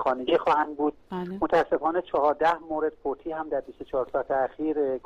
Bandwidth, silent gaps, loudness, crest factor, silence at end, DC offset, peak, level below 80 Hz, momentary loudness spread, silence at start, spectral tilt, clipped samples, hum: 9.2 kHz; none; -27 LUFS; 14 dB; 0.05 s; under 0.1%; -12 dBFS; -56 dBFS; 9 LU; 0 s; -6.5 dB/octave; under 0.1%; none